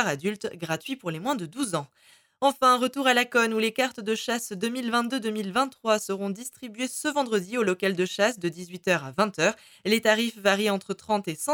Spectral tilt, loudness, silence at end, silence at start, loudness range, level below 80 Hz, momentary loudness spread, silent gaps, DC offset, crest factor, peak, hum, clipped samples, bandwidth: -3.5 dB/octave; -26 LUFS; 0 s; 0 s; 3 LU; -72 dBFS; 10 LU; none; under 0.1%; 20 dB; -6 dBFS; none; under 0.1%; 19.5 kHz